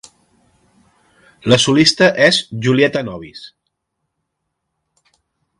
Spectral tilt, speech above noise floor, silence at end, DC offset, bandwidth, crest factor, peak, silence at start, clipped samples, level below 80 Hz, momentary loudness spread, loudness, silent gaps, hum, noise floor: -4 dB/octave; 61 dB; 2.15 s; under 0.1%; 11.5 kHz; 18 dB; 0 dBFS; 1.45 s; under 0.1%; -54 dBFS; 20 LU; -13 LUFS; none; none; -75 dBFS